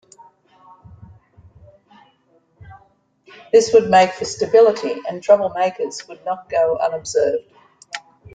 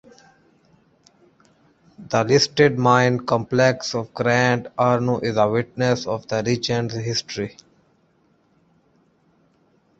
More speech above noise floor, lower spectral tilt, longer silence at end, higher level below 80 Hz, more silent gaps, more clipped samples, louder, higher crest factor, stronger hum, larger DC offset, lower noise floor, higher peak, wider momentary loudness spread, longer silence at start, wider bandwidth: about the same, 43 dB vs 42 dB; about the same, -4 dB/octave vs -5 dB/octave; second, 0.35 s vs 2.5 s; about the same, -58 dBFS vs -58 dBFS; neither; neither; first, -17 LUFS vs -20 LUFS; about the same, 18 dB vs 20 dB; neither; neither; about the same, -59 dBFS vs -62 dBFS; about the same, -2 dBFS vs -2 dBFS; first, 15 LU vs 8 LU; first, 2.65 s vs 2 s; first, 9.2 kHz vs 8 kHz